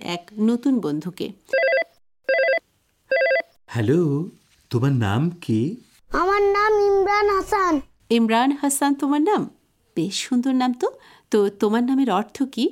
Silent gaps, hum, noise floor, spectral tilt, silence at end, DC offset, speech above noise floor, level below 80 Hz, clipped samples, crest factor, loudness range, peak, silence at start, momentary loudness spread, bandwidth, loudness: none; none; -64 dBFS; -5.5 dB/octave; 0 s; under 0.1%; 43 dB; -50 dBFS; under 0.1%; 16 dB; 3 LU; -6 dBFS; 0 s; 10 LU; 16.5 kHz; -21 LUFS